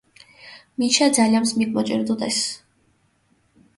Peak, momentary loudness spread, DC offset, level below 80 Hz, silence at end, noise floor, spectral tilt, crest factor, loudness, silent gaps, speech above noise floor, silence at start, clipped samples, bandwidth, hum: -4 dBFS; 17 LU; under 0.1%; -66 dBFS; 1.2 s; -63 dBFS; -3 dB/octave; 20 dB; -20 LUFS; none; 44 dB; 0.45 s; under 0.1%; 12 kHz; none